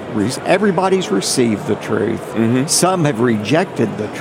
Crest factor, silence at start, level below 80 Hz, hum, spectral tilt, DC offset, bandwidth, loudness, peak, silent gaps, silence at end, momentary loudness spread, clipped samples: 14 dB; 0 s; -56 dBFS; none; -4.5 dB/octave; under 0.1%; 16.5 kHz; -16 LUFS; -2 dBFS; none; 0 s; 6 LU; under 0.1%